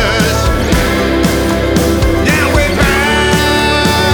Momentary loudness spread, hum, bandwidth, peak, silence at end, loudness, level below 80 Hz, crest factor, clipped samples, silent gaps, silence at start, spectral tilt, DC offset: 2 LU; none; 20 kHz; 0 dBFS; 0 s; -11 LUFS; -18 dBFS; 10 dB; under 0.1%; none; 0 s; -4.5 dB/octave; under 0.1%